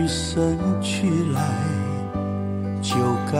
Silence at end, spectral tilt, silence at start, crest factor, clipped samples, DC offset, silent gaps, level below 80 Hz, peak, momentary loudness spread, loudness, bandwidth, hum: 0 s; -6 dB/octave; 0 s; 14 dB; under 0.1%; under 0.1%; none; -44 dBFS; -8 dBFS; 5 LU; -23 LUFS; 16 kHz; none